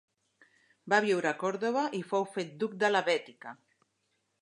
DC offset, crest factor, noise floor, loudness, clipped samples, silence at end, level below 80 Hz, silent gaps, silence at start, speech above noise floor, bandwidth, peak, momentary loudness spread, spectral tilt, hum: under 0.1%; 22 dB; -78 dBFS; -30 LUFS; under 0.1%; 0.9 s; -86 dBFS; none; 0.85 s; 48 dB; 11 kHz; -10 dBFS; 12 LU; -4.5 dB/octave; none